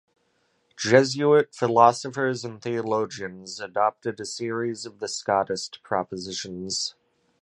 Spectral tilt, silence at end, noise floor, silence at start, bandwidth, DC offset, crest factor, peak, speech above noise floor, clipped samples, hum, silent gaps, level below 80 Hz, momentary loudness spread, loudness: -4 dB/octave; 0.5 s; -69 dBFS; 0.8 s; 11.5 kHz; under 0.1%; 22 dB; -2 dBFS; 45 dB; under 0.1%; none; none; -66 dBFS; 13 LU; -25 LUFS